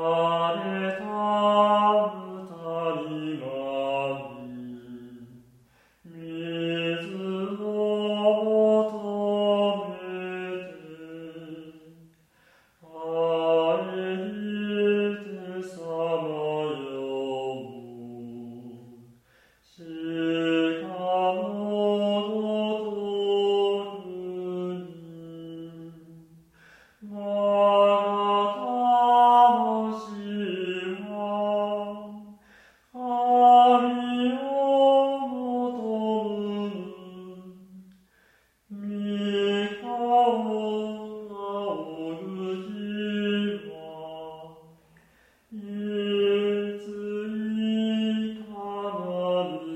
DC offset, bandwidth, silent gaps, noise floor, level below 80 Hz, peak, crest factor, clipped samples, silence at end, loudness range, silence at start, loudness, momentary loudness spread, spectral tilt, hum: under 0.1%; 9.2 kHz; none; -64 dBFS; -72 dBFS; -6 dBFS; 20 dB; under 0.1%; 0 s; 12 LU; 0 s; -26 LUFS; 21 LU; -6.5 dB/octave; none